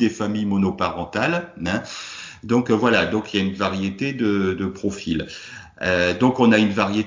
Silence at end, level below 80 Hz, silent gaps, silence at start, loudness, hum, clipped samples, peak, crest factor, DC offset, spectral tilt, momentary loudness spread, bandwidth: 0 s; -46 dBFS; none; 0 s; -21 LUFS; none; under 0.1%; -2 dBFS; 18 dB; under 0.1%; -6 dB/octave; 12 LU; 7.6 kHz